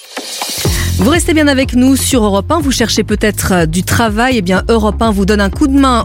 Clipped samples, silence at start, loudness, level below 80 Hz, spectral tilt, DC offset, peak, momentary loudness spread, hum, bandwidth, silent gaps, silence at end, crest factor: under 0.1%; 0.05 s; -11 LUFS; -22 dBFS; -4.5 dB/octave; under 0.1%; 0 dBFS; 4 LU; none; 17 kHz; none; 0 s; 10 dB